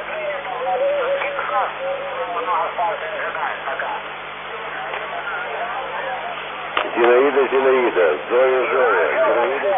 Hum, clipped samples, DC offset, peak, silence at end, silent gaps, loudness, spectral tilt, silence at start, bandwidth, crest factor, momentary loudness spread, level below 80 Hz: 50 Hz at -50 dBFS; under 0.1%; under 0.1%; 0 dBFS; 0 s; none; -20 LUFS; -7.5 dB/octave; 0 s; 3.8 kHz; 20 dB; 10 LU; -58 dBFS